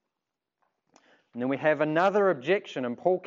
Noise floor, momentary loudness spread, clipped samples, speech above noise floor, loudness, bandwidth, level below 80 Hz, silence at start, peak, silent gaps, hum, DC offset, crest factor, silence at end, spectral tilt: -87 dBFS; 11 LU; under 0.1%; 61 dB; -26 LUFS; 7.6 kHz; -86 dBFS; 1.35 s; -10 dBFS; none; none; under 0.1%; 18 dB; 0 s; -6.5 dB/octave